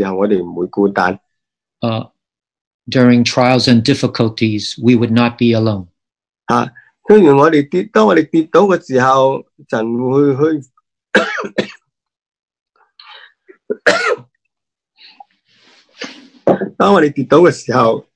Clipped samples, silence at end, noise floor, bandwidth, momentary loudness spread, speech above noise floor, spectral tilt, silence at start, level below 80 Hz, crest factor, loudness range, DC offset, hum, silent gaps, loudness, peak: 0.3%; 0.15 s; -78 dBFS; 10.5 kHz; 13 LU; 66 dB; -6 dB/octave; 0 s; -56 dBFS; 14 dB; 9 LU; under 0.1%; none; 2.61-2.79 s, 12.28-12.32 s, 12.39-12.43 s, 12.61-12.66 s; -13 LUFS; 0 dBFS